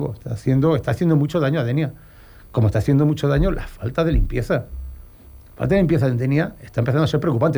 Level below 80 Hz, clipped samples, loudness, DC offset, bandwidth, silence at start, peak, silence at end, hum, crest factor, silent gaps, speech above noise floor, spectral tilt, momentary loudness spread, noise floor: -32 dBFS; under 0.1%; -20 LUFS; under 0.1%; over 20 kHz; 0 s; -6 dBFS; 0 s; none; 14 dB; none; 25 dB; -8.5 dB/octave; 10 LU; -44 dBFS